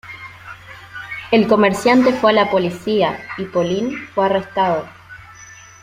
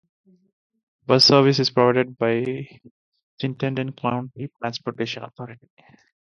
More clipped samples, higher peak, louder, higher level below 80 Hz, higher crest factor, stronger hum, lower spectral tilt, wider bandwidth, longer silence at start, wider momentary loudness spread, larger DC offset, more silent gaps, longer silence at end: neither; about the same, -2 dBFS vs -2 dBFS; first, -17 LUFS vs -21 LUFS; first, -54 dBFS vs -64 dBFS; second, 16 dB vs 22 dB; neither; about the same, -5.5 dB/octave vs -5.5 dB/octave; first, 15.5 kHz vs 11 kHz; second, 0.05 s vs 1.1 s; about the same, 22 LU vs 22 LU; neither; second, none vs 2.91-3.12 s, 3.23-3.38 s; second, 0.3 s vs 0.7 s